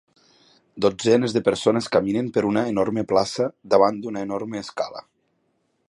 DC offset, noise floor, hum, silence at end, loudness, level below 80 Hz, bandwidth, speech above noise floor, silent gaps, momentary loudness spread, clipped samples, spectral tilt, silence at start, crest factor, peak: under 0.1%; -70 dBFS; none; 0.9 s; -22 LUFS; -58 dBFS; 11.5 kHz; 48 dB; none; 11 LU; under 0.1%; -5.5 dB/octave; 0.75 s; 20 dB; -2 dBFS